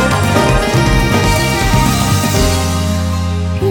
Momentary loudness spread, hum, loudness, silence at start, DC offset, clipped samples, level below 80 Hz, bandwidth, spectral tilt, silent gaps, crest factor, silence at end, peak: 4 LU; none; -13 LUFS; 0 s; under 0.1%; under 0.1%; -20 dBFS; 19.5 kHz; -5 dB/octave; none; 12 dB; 0 s; 0 dBFS